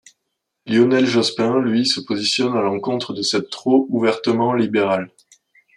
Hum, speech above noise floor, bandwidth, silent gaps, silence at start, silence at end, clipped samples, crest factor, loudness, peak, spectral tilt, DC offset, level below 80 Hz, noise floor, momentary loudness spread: none; 58 dB; 11.5 kHz; none; 0.65 s; 0.7 s; under 0.1%; 16 dB; -18 LUFS; -2 dBFS; -4.5 dB/octave; under 0.1%; -66 dBFS; -76 dBFS; 6 LU